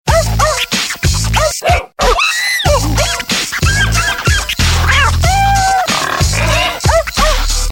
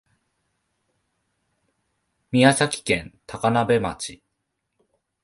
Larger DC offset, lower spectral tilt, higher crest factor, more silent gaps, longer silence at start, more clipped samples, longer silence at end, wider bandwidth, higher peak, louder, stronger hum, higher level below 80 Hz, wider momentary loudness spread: neither; second, -3 dB/octave vs -4.5 dB/octave; second, 12 dB vs 24 dB; neither; second, 0.05 s vs 2.3 s; neither; second, 0 s vs 1.1 s; first, 17 kHz vs 11.5 kHz; about the same, 0 dBFS vs -2 dBFS; first, -12 LUFS vs -21 LUFS; neither; first, -18 dBFS vs -54 dBFS; second, 3 LU vs 16 LU